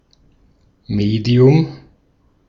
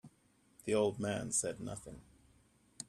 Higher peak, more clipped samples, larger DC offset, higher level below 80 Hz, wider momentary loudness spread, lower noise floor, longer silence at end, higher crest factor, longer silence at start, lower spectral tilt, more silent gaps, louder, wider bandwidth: first, -2 dBFS vs -20 dBFS; neither; neither; first, -46 dBFS vs -66 dBFS; second, 13 LU vs 17 LU; second, -57 dBFS vs -71 dBFS; first, 0.7 s vs 0.05 s; about the same, 16 dB vs 18 dB; first, 0.9 s vs 0.05 s; first, -9 dB/octave vs -4 dB/octave; neither; first, -15 LUFS vs -36 LUFS; second, 7 kHz vs 14 kHz